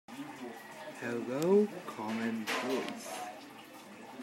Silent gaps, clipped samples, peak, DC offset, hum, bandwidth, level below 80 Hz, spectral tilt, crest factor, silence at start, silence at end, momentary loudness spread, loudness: none; under 0.1%; -16 dBFS; under 0.1%; none; 16 kHz; -86 dBFS; -5 dB/octave; 20 dB; 0.1 s; 0 s; 21 LU; -35 LUFS